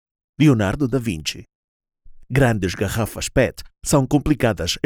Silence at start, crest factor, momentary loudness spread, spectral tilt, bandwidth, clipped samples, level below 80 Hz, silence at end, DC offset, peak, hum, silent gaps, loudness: 0.4 s; 18 dB; 9 LU; -5.5 dB/octave; 18.5 kHz; under 0.1%; -38 dBFS; 0.05 s; under 0.1%; -2 dBFS; none; 1.55-1.80 s; -20 LUFS